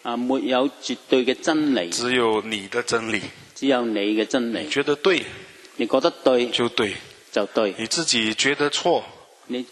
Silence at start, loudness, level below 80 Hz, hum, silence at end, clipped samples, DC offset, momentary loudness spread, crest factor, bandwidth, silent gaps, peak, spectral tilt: 0.05 s; -22 LUFS; -64 dBFS; none; 0.05 s; under 0.1%; under 0.1%; 9 LU; 20 dB; 12.5 kHz; none; -2 dBFS; -3 dB/octave